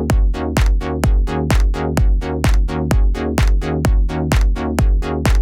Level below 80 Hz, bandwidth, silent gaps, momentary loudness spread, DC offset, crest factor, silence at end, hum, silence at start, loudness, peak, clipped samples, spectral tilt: -16 dBFS; 15 kHz; none; 1 LU; under 0.1%; 10 dB; 0 s; none; 0 s; -18 LUFS; -4 dBFS; under 0.1%; -6.5 dB/octave